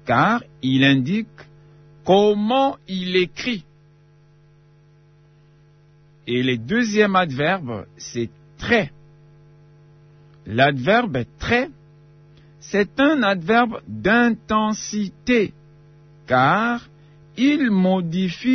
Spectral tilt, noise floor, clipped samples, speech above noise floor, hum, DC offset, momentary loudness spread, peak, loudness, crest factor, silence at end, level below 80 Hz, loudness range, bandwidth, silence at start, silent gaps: -5.5 dB/octave; -52 dBFS; under 0.1%; 33 dB; 50 Hz at -60 dBFS; under 0.1%; 13 LU; -2 dBFS; -20 LUFS; 18 dB; 0 s; -52 dBFS; 7 LU; 6.6 kHz; 0.05 s; none